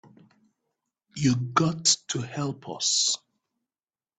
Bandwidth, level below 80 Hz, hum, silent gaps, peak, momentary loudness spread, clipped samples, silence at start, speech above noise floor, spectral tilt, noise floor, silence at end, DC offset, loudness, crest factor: 9.4 kHz; -64 dBFS; none; none; -8 dBFS; 10 LU; under 0.1%; 1.15 s; over 64 dB; -3 dB/octave; under -90 dBFS; 1.05 s; under 0.1%; -25 LUFS; 22 dB